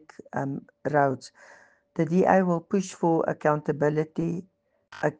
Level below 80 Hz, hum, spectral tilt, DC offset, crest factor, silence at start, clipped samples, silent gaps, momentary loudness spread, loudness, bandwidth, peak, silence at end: -66 dBFS; none; -7.5 dB/octave; under 0.1%; 22 dB; 0.35 s; under 0.1%; none; 14 LU; -26 LUFS; 9.4 kHz; -4 dBFS; 0.05 s